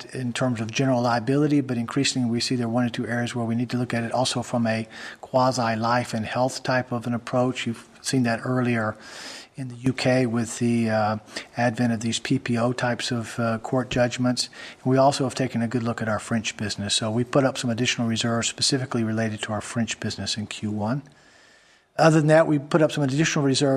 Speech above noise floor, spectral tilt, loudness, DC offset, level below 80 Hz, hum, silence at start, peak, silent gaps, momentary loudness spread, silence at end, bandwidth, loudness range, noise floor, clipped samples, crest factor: 33 dB; -5 dB/octave; -24 LUFS; under 0.1%; -56 dBFS; none; 0 s; -2 dBFS; none; 8 LU; 0 s; 13.5 kHz; 2 LU; -56 dBFS; under 0.1%; 22 dB